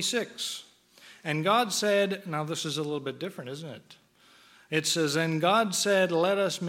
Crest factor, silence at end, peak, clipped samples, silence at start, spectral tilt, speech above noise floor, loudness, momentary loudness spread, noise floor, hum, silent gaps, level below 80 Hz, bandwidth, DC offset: 20 dB; 0 s; -10 dBFS; under 0.1%; 0 s; -3.5 dB/octave; 31 dB; -27 LUFS; 15 LU; -59 dBFS; none; none; -80 dBFS; 17 kHz; under 0.1%